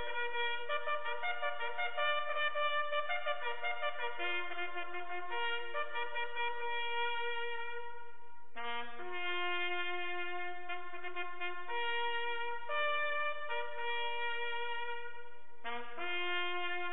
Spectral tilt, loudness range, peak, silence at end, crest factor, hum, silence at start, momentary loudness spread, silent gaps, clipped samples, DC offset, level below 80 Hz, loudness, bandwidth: -5.5 dB/octave; 4 LU; -20 dBFS; 0 s; 18 dB; none; 0 s; 9 LU; none; under 0.1%; 1%; -86 dBFS; -38 LUFS; 4.1 kHz